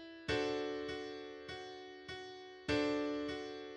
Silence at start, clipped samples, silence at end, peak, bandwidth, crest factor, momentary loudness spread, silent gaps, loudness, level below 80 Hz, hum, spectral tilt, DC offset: 0 s; under 0.1%; 0 s; -24 dBFS; 10 kHz; 18 dB; 12 LU; none; -41 LUFS; -64 dBFS; none; -5 dB/octave; under 0.1%